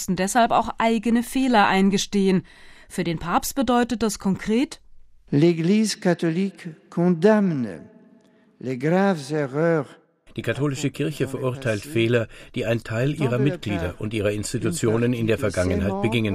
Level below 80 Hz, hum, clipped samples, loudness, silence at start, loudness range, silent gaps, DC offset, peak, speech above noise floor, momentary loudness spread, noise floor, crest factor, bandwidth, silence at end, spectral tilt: -46 dBFS; none; under 0.1%; -22 LUFS; 0 s; 4 LU; none; under 0.1%; -4 dBFS; 34 dB; 10 LU; -55 dBFS; 18 dB; 15.5 kHz; 0 s; -5.5 dB/octave